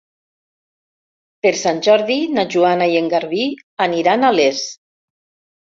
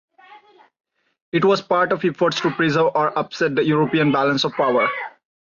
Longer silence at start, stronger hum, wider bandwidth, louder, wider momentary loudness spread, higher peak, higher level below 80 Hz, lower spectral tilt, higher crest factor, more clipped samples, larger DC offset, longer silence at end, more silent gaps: first, 1.45 s vs 0.3 s; neither; about the same, 7.8 kHz vs 7.4 kHz; first, -16 LUFS vs -19 LUFS; about the same, 7 LU vs 5 LU; first, -2 dBFS vs -6 dBFS; about the same, -64 dBFS vs -62 dBFS; second, -4 dB/octave vs -6 dB/octave; about the same, 16 dB vs 14 dB; neither; neither; first, 1.05 s vs 0.4 s; about the same, 3.63-3.77 s vs 1.22-1.32 s